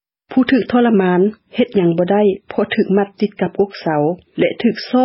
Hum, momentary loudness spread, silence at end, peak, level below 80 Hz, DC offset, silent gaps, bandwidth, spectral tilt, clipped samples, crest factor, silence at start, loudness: none; 7 LU; 0 s; -2 dBFS; -56 dBFS; under 0.1%; none; 5.8 kHz; -10.5 dB/octave; under 0.1%; 14 dB; 0.3 s; -16 LUFS